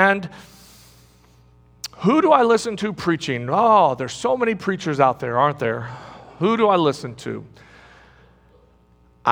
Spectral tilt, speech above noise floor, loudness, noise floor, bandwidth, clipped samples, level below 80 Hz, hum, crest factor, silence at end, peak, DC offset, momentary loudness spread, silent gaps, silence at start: -5.5 dB/octave; 36 dB; -19 LUFS; -55 dBFS; over 20 kHz; under 0.1%; -58 dBFS; 60 Hz at -50 dBFS; 20 dB; 0 s; 0 dBFS; under 0.1%; 19 LU; none; 0 s